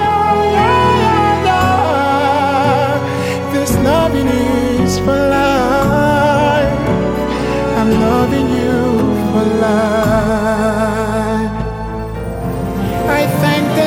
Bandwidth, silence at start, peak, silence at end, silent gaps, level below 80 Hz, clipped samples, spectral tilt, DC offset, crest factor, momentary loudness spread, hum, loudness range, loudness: 17 kHz; 0 s; -2 dBFS; 0 s; none; -30 dBFS; under 0.1%; -6 dB/octave; under 0.1%; 12 dB; 6 LU; none; 3 LU; -14 LUFS